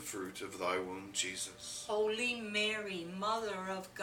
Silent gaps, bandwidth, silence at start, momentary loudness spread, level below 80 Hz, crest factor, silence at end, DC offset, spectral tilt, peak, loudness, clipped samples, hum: none; 18.5 kHz; 0 s; 8 LU; -72 dBFS; 18 dB; 0 s; under 0.1%; -2 dB/octave; -20 dBFS; -37 LUFS; under 0.1%; none